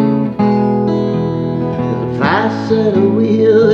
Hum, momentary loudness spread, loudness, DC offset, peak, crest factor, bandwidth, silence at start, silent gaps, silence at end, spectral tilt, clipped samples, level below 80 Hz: none; 6 LU; -14 LUFS; under 0.1%; 0 dBFS; 12 dB; 6.8 kHz; 0 s; none; 0 s; -8.5 dB/octave; under 0.1%; -46 dBFS